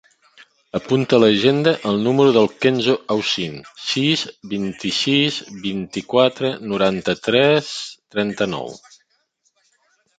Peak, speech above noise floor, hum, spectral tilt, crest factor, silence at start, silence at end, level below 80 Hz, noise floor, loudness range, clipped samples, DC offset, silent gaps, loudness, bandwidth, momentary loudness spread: -2 dBFS; 48 dB; none; -5 dB/octave; 18 dB; 0.75 s; 1.4 s; -58 dBFS; -66 dBFS; 4 LU; under 0.1%; under 0.1%; none; -19 LUFS; 9.2 kHz; 12 LU